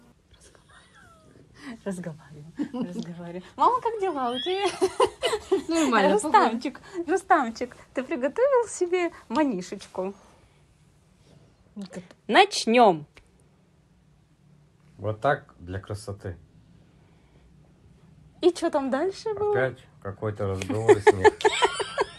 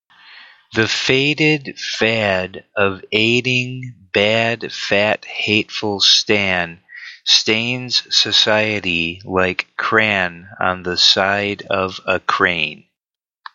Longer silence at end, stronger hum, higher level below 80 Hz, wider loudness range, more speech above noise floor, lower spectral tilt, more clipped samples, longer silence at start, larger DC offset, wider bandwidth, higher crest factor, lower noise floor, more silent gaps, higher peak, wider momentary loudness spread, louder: second, 0 s vs 0.8 s; neither; about the same, -60 dBFS vs -56 dBFS; first, 10 LU vs 3 LU; second, 35 dB vs 72 dB; first, -4.5 dB/octave vs -3 dB/octave; neither; first, 1.6 s vs 0.3 s; neither; first, 12.5 kHz vs 8 kHz; about the same, 22 dB vs 18 dB; second, -60 dBFS vs -89 dBFS; neither; second, -4 dBFS vs 0 dBFS; first, 19 LU vs 10 LU; second, -25 LUFS vs -16 LUFS